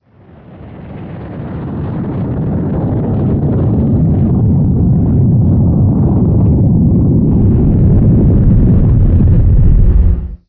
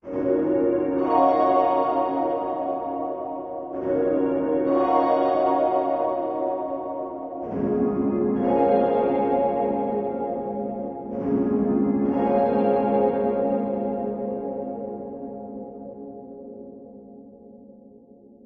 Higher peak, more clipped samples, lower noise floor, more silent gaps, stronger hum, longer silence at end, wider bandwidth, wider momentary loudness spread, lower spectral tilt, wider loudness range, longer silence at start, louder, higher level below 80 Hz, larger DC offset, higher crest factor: first, 0 dBFS vs -6 dBFS; neither; second, -39 dBFS vs -50 dBFS; neither; neither; second, 0.15 s vs 0.5 s; second, 3 kHz vs 4.9 kHz; second, 12 LU vs 16 LU; first, -14.5 dB/octave vs -10.5 dB/octave; second, 7 LU vs 10 LU; first, 0.5 s vs 0.05 s; first, -11 LUFS vs -23 LUFS; first, -16 dBFS vs -56 dBFS; neither; second, 10 dB vs 18 dB